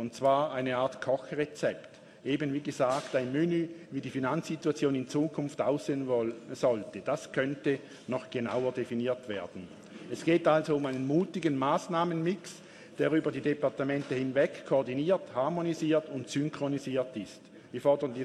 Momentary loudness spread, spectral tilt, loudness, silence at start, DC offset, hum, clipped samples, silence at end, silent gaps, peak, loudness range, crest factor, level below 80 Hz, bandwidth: 10 LU; -6.5 dB/octave; -31 LUFS; 0 s; under 0.1%; none; under 0.1%; 0 s; none; -12 dBFS; 2 LU; 20 dB; -72 dBFS; 12.5 kHz